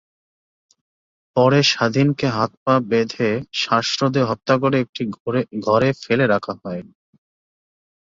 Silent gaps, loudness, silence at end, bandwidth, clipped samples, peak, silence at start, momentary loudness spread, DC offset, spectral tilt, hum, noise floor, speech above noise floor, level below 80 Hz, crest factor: 2.57-2.66 s, 4.89-4.93 s, 5.20-5.26 s; -19 LUFS; 1.35 s; 7.8 kHz; under 0.1%; -2 dBFS; 1.35 s; 9 LU; under 0.1%; -5.5 dB/octave; none; under -90 dBFS; over 71 dB; -58 dBFS; 18 dB